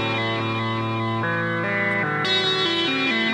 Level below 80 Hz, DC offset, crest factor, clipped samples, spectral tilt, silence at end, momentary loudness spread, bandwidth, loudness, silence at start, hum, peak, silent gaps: -60 dBFS; under 0.1%; 14 dB; under 0.1%; -5 dB/octave; 0 s; 5 LU; 11 kHz; -22 LUFS; 0 s; none; -10 dBFS; none